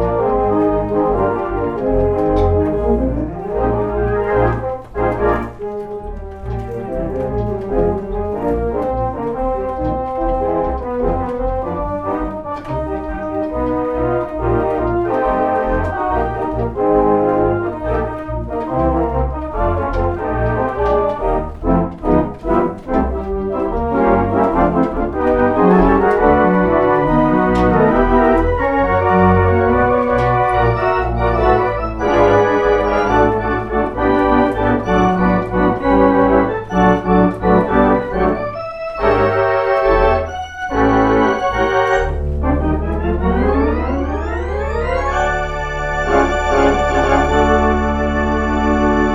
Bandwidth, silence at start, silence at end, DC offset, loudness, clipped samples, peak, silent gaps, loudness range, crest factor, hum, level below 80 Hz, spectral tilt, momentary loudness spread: 8 kHz; 0 s; 0 s; under 0.1%; -16 LUFS; under 0.1%; 0 dBFS; none; 7 LU; 16 dB; none; -26 dBFS; -8 dB/octave; 8 LU